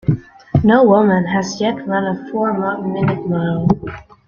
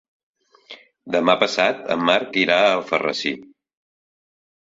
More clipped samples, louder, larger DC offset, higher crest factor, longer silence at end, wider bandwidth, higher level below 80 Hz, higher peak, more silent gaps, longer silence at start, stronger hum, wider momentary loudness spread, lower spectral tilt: neither; first, -16 LUFS vs -19 LUFS; neither; second, 14 dB vs 22 dB; second, 0.25 s vs 1.2 s; about the same, 7.2 kHz vs 7.8 kHz; first, -42 dBFS vs -66 dBFS; about the same, -2 dBFS vs 0 dBFS; neither; second, 0.05 s vs 0.7 s; neither; about the same, 9 LU vs 9 LU; first, -7.5 dB/octave vs -4 dB/octave